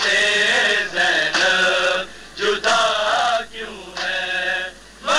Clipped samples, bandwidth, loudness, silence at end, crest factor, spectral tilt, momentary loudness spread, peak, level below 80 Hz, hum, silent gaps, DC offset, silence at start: under 0.1%; 13.5 kHz; -18 LUFS; 0 s; 14 dB; -0.5 dB/octave; 15 LU; -6 dBFS; -52 dBFS; none; none; under 0.1%; 0 s